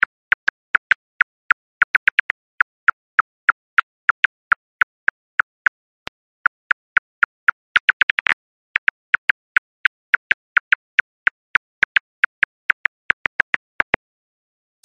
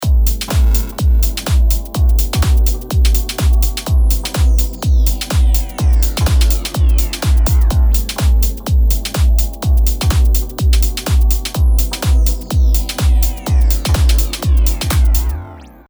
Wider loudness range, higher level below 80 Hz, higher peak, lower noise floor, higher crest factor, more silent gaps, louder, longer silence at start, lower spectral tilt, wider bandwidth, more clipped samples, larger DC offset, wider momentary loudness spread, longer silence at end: about the same, 2 LU vs 1 LU; second, -60 dBFS vs -12 dBFS; second, -4 dBFS vs 0 dBFS; first, under -90 dBFS vs -33 dBFS; first, 18 dB vs 12 dB; first, 1.84-2.87 s, 2.93-3.77 s, 3.83-8.25 s vs none; second, -19 LUFS vs -15 LUFS; first, 1.8 s vs 0 s; second, -2 dB/octave vs -5 dB/octave; second, 8 kHz vs over 20 kHz; neither; neither; first, 5 LU vs 2 LU; first, 6.5 s vs 0.2 s